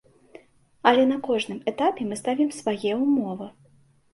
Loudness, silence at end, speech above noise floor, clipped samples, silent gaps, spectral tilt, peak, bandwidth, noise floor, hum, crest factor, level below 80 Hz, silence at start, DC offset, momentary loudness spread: -24 LUFS; 0.65 s; 35 dB; under 0.1%; none; -5 dB/octave; -2 dBFS; 11.5 kHz; -59 dBFS; none; 22 dB; -68 dBFS; 0.85 s; under 0.1%; 10 LU